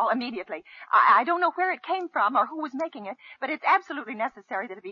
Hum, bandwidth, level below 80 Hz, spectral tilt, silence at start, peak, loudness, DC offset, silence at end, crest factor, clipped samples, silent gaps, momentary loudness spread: none; 7.2 kHz; -80 dBFS; -5 dB/octave; 0 s; -8 dBFS; -25 LUFS; under 0.1%; 0 s; 18 dB; under 0.1%; none; 16 LU